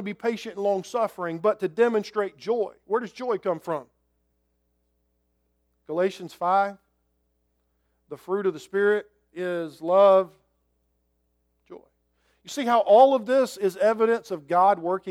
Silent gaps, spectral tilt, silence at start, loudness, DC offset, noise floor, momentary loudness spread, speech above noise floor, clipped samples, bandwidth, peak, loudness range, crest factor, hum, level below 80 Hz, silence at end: none; -5.5 dB/octave; 0 s; -24 LUFS; under 0.1%; -72 dBFS; 13 LU; 49 dB; under 0.1%; 14.5 kHz; -6 dBFS; 9 LU; 20 dB; none; -74 dBFS; 0 s